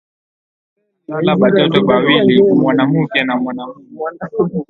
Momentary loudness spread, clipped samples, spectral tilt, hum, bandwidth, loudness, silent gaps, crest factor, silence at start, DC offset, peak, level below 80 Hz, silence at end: 15 LU; under 0.1%; -9 dB/octave; none; 4.4 kHz; -13 LUFS; none; 14 dB; 1.1 s; under 0.1%; 0 dBFS; -54 dBFS; 0.05 s